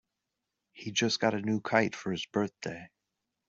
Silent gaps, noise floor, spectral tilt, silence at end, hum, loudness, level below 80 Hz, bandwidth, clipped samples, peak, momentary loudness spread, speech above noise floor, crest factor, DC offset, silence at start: none; -86 dBFS; -4 dB/octave; 0.6 s; none; -31 LUFS; -72 dBFS; 8 kHz; under 0.1%; -8 dBFS; 13 LU; 55 dB; 24 dB; under 0.1%; 0.75 s